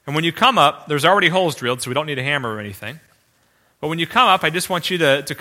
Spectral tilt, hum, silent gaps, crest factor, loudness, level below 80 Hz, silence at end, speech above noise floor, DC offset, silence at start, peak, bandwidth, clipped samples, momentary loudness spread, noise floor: -4 dB/octave; none; none; 18 dB; -17 LUFS; -58 dBFS; 0 s; 42 dB; under 0.1%; 0.05 s; 0 dBFS; 16.5 kHz; under 0.1%; 14 LU; -60 dBFS